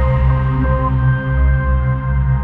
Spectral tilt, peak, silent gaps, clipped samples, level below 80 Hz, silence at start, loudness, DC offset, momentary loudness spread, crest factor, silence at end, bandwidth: -11 dB/octave; -4 dBFS; none; under 0.1%; -18 dBFS; 0 s; -16 LUFS; under 0.1%; 2 LU; 10 dB; 0 s; 3.5 kHz